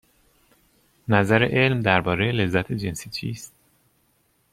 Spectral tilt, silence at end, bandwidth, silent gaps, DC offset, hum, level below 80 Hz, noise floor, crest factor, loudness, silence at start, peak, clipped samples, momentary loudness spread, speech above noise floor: -6 dB/octave; 1.05 s; 15.5 kHz; none; under 0.1%; none; -54 dBFS; -66 dBFS; 22 dB; -22 LUFS; 1.1 s; -2 dBFS; under 0.1%; 16 LU; 44 dB